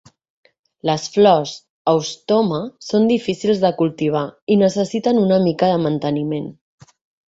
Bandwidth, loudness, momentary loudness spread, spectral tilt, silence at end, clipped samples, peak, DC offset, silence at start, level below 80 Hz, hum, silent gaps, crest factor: 8 kHz; -18 LUFS; 9 LU; -6.5 dB/octave; 0.75 s; under 0.1%; -2 dBFS; under 0.1%; 0.85 s; -58 dBFS; none; 1.70-1.85 s, 4.42-4.47 s; 16 dB